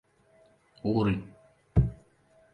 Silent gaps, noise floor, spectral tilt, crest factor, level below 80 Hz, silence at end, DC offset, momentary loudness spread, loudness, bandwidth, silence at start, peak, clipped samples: none; -63 dBFS; -9.5 dB/octave; 20 dB; -40 dBFS; 0.6 s; under 0.1%; 8 LU; -29 LUFS; 5.2 kHz; 0.85 s; -10 dBFS; under 0.1%